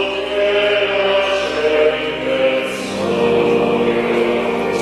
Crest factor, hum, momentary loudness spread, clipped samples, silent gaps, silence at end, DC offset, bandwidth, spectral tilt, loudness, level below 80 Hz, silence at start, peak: 12 dB; none; 5 LU; under 0.1%; none; 0 s; under 0.1%; 13 kHz; -4.5 dB/octave; -16 LUFS; -46 dBFS; 0 s; -4 dBFS